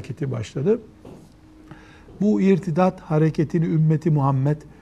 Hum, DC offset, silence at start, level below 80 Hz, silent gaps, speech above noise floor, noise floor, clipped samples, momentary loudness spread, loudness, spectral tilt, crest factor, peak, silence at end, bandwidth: none; under 0.1%; 0 s; -52 dBFS; none; 27 dB; -47 dBFS; under 0.1%; 6 LU; -21 LUFS; -9 dB/octave; 16 dB; -6 dBFS; 0.15 s; 8.4 kHz